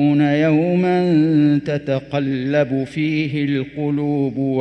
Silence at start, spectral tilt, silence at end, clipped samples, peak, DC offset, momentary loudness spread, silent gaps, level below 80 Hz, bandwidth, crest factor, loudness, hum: 0 s; -8.5 dB/octave; 0 s; under 0.1%; -4 dBFS; under 0.1%; 7 LU; none; -54 dBFS; 6.2 kHz; 12 dB; -18 LUFS; none